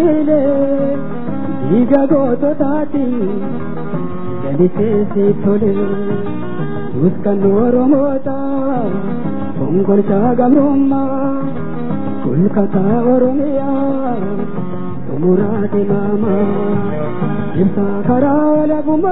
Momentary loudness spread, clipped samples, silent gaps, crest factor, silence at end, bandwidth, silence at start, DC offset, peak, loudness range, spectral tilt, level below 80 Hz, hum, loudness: 10 LU; under 0.1%; none; 14 dB; 0 s; 4 kHz; 0 s; 10%; 0 dBFS; 2 LU; -13 dB/octave; -50 dBFS; none; -15 LUFS